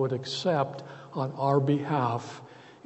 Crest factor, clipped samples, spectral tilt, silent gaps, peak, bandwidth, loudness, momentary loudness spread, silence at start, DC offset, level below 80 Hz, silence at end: 18 dB; under 0.1%; -6.5 dB/octave; none; -12 dBFS; 8.2 kHz; -28 LUFS; 16 LU; 0 s; under 0.1%; -70 dBFS; 0.1 s